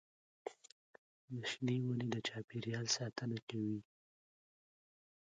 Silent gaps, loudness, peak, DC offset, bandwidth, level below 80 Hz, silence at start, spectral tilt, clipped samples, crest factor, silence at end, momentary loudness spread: 0.72-1.28 s, 2.44-2.48 s, 3.42-3.47 s; -41 LUFS; -22 dBFS; under 0.1%; 9 kHz; -80 dBFS; 0.45 s; -4.5 dB/octave; under 0.1%; 22 dB; 1.55 s; 14 LU